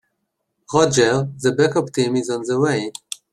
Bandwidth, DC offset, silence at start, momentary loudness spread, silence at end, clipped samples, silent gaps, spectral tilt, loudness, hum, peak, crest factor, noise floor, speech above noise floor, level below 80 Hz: 13 kHz; under 0.1%; 0.7 s; 8 LU; 0.2 s; under 0.1%; none; -5 dB/octave; -19 LUFS; none; -2 dBFS; 18 dB; -74 dBFS; 56 dB; -56 dBFS